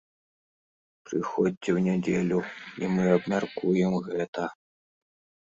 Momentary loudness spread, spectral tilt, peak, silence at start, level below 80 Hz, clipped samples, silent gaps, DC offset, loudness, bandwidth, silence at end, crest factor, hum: 10 LU; -7.5 dB/octave; -8 dBFS; 1.1 s; -64 dBFS; under 0.1%; 1.57-1.61 s, 4.28-4.33 s; under 0.1%; -27 LUFS; 7.8 kHz; 1.05 s; 20 dB; none